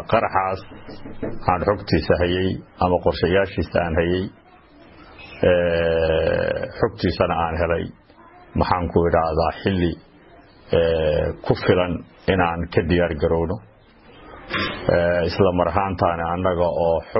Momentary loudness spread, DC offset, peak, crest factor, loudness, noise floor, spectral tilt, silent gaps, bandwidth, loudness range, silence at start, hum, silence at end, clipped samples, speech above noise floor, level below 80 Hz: 9 LU; under 0.1%; -2 dBFS; 18 dB; -21 LUFS; -48 dBFS; -10.5 dB/octave; none; 5.8 kHz; 1 LU; 0 s; none; 0 s; under 0.1%; 28 dB; -38 dBFS